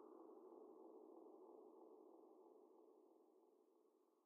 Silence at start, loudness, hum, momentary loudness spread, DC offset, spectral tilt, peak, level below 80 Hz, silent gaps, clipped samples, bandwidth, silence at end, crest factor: 0 s; -65 LUFS; none; 5 LU; under 0.1%; 6 dB/octave; -50 dBFS; under -90 dBFS; none; under 0.1%; 1.5 kHz; 0 s; 16 dB